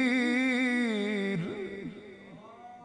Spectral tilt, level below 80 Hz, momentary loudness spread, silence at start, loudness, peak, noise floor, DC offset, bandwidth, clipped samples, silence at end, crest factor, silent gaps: -5.5 dB/octave; -70 dBFS; 23 LU; 0 s; -29 LUFS; -16 dBFS; -49 dBFS; under 0.1%; 10.5 kHz; under 0.1%; 0 s; 14 dB; none